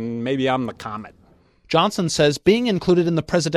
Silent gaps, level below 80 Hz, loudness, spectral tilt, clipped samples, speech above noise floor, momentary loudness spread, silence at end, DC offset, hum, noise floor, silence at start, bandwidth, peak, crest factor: none; -50 dBFS; -20 LUFS; -5 dB/octave; under 0.1%; 35 dB; 12 LU; 0 s; under 0.1%; none; -54 dBFS; 0 s; 13 kHz; -4 dBFS; 18 dB